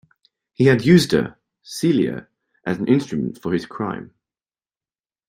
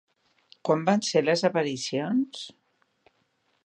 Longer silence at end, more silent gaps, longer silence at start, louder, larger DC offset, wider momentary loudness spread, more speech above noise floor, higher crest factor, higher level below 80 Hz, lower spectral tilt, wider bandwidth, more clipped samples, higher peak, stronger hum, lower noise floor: about the same, 1.25 s vs 1.15 s; neither; about the same, 0.6 s vs 0.65 s; first, -19 LUFS vs -26 LUFS; neither; first, 17 LU vs 12 LU; first, over 72 dB vs 46 dB; about the same, 20 dB vs 20 dB; first, -54 dBFS vs -78 dBFS; first, -6.5 dB/octave vs -4.5 dB/octave; first, 16 kHz vs 10.5 kHz; neither; first, -2 dBFS vs -8 dBFS; neither; first, under -90 dBFS vs -71 dBFS